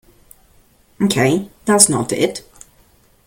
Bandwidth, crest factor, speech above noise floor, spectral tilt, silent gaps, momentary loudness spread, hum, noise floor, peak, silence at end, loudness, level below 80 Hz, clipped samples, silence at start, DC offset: 17 kHz; 20 dB; 37 dB; -3.5 dB/octave; none; 10 LU; none; -53 dBFS; 0 dBFS; 0.9 s; -15 LUFS; -52 dBFS; under 0.1%; 1 s; under 0.1%